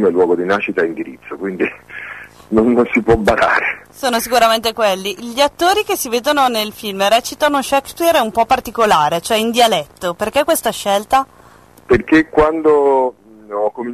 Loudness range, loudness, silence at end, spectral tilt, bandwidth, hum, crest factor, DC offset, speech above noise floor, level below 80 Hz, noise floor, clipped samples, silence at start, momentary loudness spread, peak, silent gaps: 2 LU; -15 LUFS; 0 s; -3.5 dB/octave; 13.5 kHz; none; 14 dB; under 0.1%; 29 dB; -40 dBFS; -44 dBFS; under 0.1%; 0 s; 9 LU; -2 dBFS; none